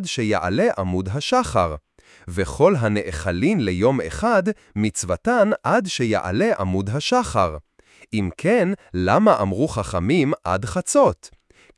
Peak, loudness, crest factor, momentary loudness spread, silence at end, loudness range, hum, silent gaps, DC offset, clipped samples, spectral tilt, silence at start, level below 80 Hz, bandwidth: -2 dBFS; -20 LUFS; 20 dB; 8 LU; 0.5 s; 2 LU; none; none; under 0.1%; under 0.1%; -5.5 dB/octave; 0 s; -44 dBFS; 12 kHz